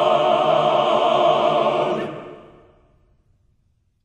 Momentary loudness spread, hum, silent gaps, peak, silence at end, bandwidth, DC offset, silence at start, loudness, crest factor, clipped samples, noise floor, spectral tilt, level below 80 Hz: 13 LU; none; none; -6 dBFS; 1.65 s; 9 kHz; under 0.1%; 0 s; -18 LUFS; 14 dB; under 0.1%; -64 dBFS; -5.5 dB/octave; -62 dBFS